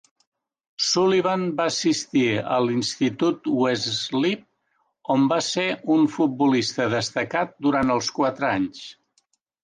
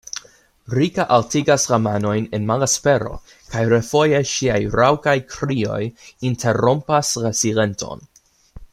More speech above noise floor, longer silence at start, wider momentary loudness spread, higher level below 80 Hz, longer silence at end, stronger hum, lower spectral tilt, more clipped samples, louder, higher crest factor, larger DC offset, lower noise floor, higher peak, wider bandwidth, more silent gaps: first, 49 dB vs 25 dB; first, 0.8 s vs 0.15 s; second, 5 LU vs 13 LU; second, -62 dBFS vs -46 dBFS; first, 0.7 s vs 0.1 s; neither; about the same, -4.5 dB/octave vs -4.5 dB/octave; neither; second, -22 LUFS vs -19 LUFS; about the same, 14 dB vs 18 dB; neither; first, -71 dBFS vs -43 dBFS; second, -8 dBFS vs -2 dBFS; second, 9.8 kHz vs 15.5 kHz; neither